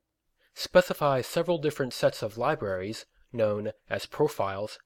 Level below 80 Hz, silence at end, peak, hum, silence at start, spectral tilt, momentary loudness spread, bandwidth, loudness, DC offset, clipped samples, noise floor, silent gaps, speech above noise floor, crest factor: -60 dBFS; 0.1 s; -8 dBFS; none; 0.55 s; -5 dB/octave; 11 LU; 17.5 kHz; -28 LUFS; under 0.1%; under 0.1%; -72 dBFS; none; 44 dB; 22 dB